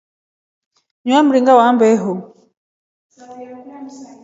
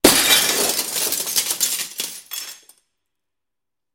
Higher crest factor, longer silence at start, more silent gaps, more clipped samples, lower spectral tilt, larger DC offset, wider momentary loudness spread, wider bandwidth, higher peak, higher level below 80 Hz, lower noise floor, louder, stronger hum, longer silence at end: second, 16 dB vs 22 dB; first, 1.05 s vs 0.05 s; first, 2.57-3.10 s vs none; neither; first, -5.5 dB/octave vs -0.5 dB/octave; neither; first, 24 LU vs 17 LU; second, 7.8 kHz vs 17 kHz; about the same, 0 dBFS vs 0 dBFS; second, -70 dBFS vs -50 dBFS; second, -35 dBFS vs -87 dBFS; first, -13 LUFS vs -17 LUFS; neither; second, 0.2 s vs 1.4 s